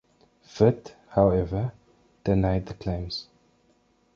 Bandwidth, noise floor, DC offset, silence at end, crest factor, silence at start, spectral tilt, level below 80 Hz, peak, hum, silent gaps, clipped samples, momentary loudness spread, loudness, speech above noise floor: 7 kHz; -65 dBFS; under 0.1%; 0.9 s; 22 dB; 0.55 s; -8 dB/octave; -42 dBFS; -6 dBFS; none; none; under 0.1%; 13 LU; -26 LUFS; 41 dB